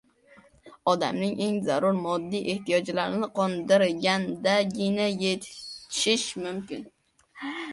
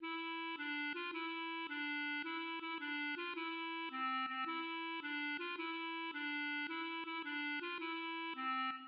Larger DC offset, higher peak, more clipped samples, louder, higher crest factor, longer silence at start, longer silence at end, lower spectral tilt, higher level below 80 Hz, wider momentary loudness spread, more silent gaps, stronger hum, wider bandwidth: neither; first, -8 dBFS vs -32 dBFS; neither; first, -26 LUFS vs -41 LUFS; first, 20 dB vs 12 dB; first, 0.65 s vs 0 s; about the same, 0 s vs 0 s; first, -4 dB/octave vs 2.5 dB/octave; first, -68 dBFS vs under -90 dBFS; first, 12 LU vs 3 LU; neither; neither; first, 11.5 kHz vs 5.6 kHz